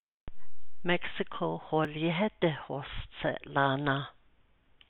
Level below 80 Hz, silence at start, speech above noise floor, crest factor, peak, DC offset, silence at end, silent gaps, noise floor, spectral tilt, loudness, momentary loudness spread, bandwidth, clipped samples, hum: -54 dBFS; 0 s; 33 dB; 20 dB; -12 dBFS; under 0.1%; 0 s; 0.00-0.27 s; -65 dBFS; -4 dB/octave; -32 LUFS; 10 LU; 4.2 kHz; under 0.1%; none